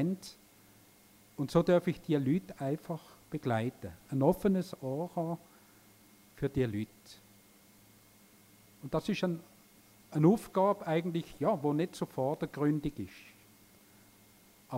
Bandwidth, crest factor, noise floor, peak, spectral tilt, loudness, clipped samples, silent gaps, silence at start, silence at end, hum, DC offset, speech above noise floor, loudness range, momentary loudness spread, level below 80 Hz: 16 kHz; 20 dB; -61 dBFS; -14 dBFS; -7.5 dB/octave; -33 LUFS; under 0.1%; none; 0 s; 0 s; none; under 0.1%; 29 dB; 8 LU; 16 LU; -62 dBFS